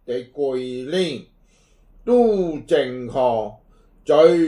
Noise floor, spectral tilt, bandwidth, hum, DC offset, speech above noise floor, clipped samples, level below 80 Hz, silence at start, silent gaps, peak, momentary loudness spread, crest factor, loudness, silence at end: -56 dBFS; -6.5 dB/octave; 11 kHz; none; under 0.1%; 37 dB; under 0.1%; -52 dBFS; 0.1 s; none; -2 dBFS; 15 LU; 18 dB; -20 LUFS; 0 s